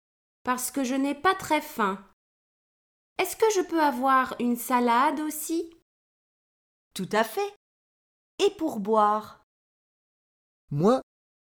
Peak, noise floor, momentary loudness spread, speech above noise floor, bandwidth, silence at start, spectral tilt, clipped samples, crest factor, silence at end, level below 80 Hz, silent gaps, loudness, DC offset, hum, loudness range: -10 dBFS; under -90 dBFS; 11 LU; over 65 dB; over 20 kHz; 0.45 s; -4.5 dB/octave; under 0.1%; 18 dB; 0.4 s; -66 dBFS; 2.13-3.16 s, 5.82-6.91 s, 7.56-8.38 s, 9.43-10.68 s; -26 LUFS; under 0.1%; none; 6 LU